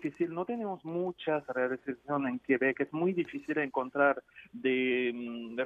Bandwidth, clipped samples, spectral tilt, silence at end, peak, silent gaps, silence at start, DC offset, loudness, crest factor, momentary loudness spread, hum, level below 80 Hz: 7 kHz; under 0.1%; -7.5 dB/octave; 0 s; -14 dBFS; none; 0 s; under 0.1%; -32 LUFS; 18 dB; 8 LU; none; -76 dBFS